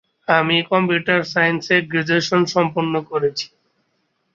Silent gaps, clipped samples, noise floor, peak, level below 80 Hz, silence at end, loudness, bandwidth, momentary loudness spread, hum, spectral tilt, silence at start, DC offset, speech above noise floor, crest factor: none; under 0.1%; -68 dBFS; -2 dBFS; -62 dBFS; 0.9 s; -18 LUFS; 7.6 kHz; 6 LU; none; -5 dB/octave; 0.3 s; under 0.1%; 50 dB; 18 dB